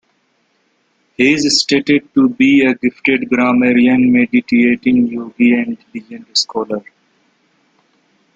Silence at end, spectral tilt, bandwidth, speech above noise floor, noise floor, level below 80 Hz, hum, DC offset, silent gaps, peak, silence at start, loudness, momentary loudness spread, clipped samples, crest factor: 1.55 s; -4 dB/octave; 9 kHz; 48 dB; -61 dBFS; -56 dBFS; none; under 0.1%; none; 0 dBFS; 1.2 s; -13 LUFS; 11 LU; under 0.1%; 14 dB